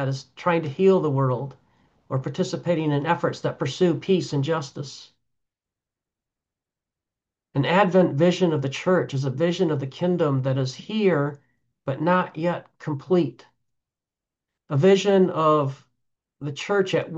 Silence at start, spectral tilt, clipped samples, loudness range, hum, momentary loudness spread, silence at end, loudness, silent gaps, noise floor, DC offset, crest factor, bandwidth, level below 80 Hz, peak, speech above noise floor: 0 s; -7 dB/octave; under 0.1%; 5 LU; none; 12 LU; 0 s; -23 LUFS; none; -89 dBFS; under 0.1%; 18 dB; 8 kHz; -70 dBFS; -6 dBFS; 67 dB